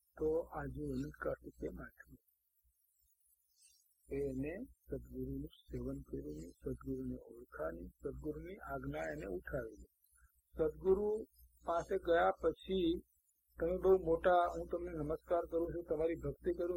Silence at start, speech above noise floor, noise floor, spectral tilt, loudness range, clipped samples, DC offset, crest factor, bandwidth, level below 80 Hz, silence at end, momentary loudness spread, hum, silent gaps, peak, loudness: 0.15 s; 40 dB; -79 dBFS; -7.5 dB/octave; 13 LU; under 0.1%; under 0.1%; 20 dB; 16.5 kHz; -56 dBFS; 0 s; 15 LU; none; none; -20 dBFS; -39 LUFS